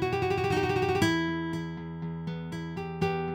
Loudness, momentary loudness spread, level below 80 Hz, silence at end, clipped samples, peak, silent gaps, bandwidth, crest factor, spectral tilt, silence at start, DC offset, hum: -30 LUFS; 11 LU; -52 dBFS; 0 s; under 0.1%; -12 dBFS; none; 17 kHz; 18 dB; -6 dB/octave; 0 s; under 0.1%; none